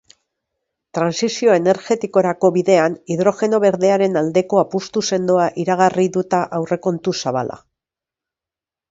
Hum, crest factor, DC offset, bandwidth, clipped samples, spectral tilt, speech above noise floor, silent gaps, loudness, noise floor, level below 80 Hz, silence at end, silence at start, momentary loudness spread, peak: none; 18 dB; under 0.1%; 7.8 kHz; under 0.1%; -5.5 dB/octave; 72 dB; none; -17 LUFS; -89 dBFS; -62 dBFS; 1.35 s; 0.95 s; 6 LU; 0 dBFS